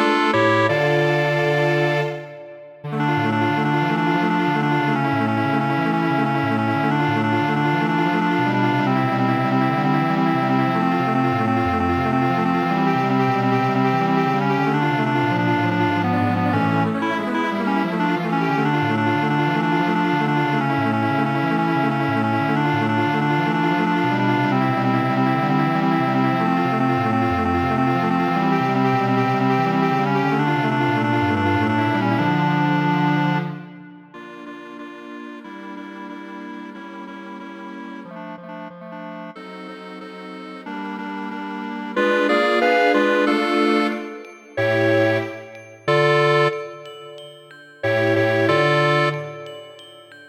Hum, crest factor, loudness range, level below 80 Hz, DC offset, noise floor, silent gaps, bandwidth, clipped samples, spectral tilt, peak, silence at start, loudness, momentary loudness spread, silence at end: none; 16 dB; 14 LU; -56 dBFS; under 0.1%; -44 dBFS; none; 17.5 kHz; under 0.1%; -7 dB/octave; -4 dBFS; 0 s; -19 LUFS; 17 LU; 0 s